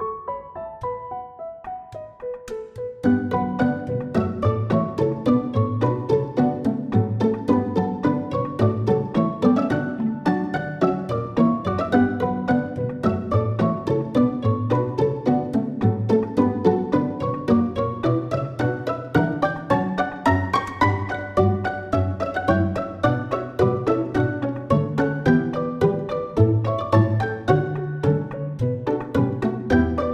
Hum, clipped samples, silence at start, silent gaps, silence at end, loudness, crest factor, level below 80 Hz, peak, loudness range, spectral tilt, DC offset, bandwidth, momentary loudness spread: none; under 0.1%; 0 s; none; 0 s; -22 LUFS; 18 dB; -48 dBFS; -4 dBFS; 2 LU; -9 dB/octave; under 0.1%; 9.2 kHz; 8 LU